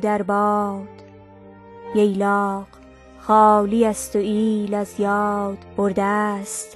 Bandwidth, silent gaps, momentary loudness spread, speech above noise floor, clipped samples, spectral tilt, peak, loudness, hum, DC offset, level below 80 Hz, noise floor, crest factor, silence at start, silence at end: 12.5 kHz; none; 12 LU; 24 dB; under 0.1%; -6 dB/octave; -4 dBFS; -20 LUFS; none; under 0.1%; -54 dBFS; -44 dBFS; 18 dB; 0 s; 0 s